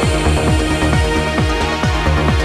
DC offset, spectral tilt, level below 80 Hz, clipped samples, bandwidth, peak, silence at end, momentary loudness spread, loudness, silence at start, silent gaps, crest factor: under 0.1%; -5.5 dB/octave; -20 dBFS; under 0.1%; 13.5 kHz; -2 dBFS; 0 s; 2 LU; -15 LUFS; 0 s; none; 12 dB